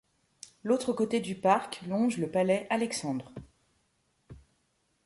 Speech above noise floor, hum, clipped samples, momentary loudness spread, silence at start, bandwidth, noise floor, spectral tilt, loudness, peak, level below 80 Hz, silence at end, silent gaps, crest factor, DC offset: 45 dB; none; under 0.1%; 20 LU; 0.65 s; 11.5 kHz; -74 dBFS; -5 dB/octave; -30 LUFS; -10 dBFS; -66 dBFS; 0.7 s; none; 20 dB; under 0.1%